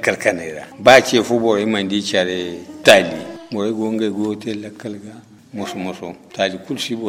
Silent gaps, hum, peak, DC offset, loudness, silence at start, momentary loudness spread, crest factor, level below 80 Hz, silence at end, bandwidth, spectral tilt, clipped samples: none; none; 0 dBFS; under 0.1%; -17 LUFS; 0 s; 19 LU; 18 dB; -56 dBFS; 0 s; 16 kHz; -4 dB/octave; under 0.1%